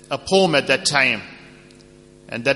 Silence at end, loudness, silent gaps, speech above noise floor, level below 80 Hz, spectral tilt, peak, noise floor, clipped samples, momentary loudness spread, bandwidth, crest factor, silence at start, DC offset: 0 s; -18 LUFS; none; 28 dB; -54 dBFS; -3.5 dB/octave; -2 dBFS; -47 dBFS; under 0.1%; 14 LU; 11.5 kHz; 20 dB; 0.1 s; under 0.1%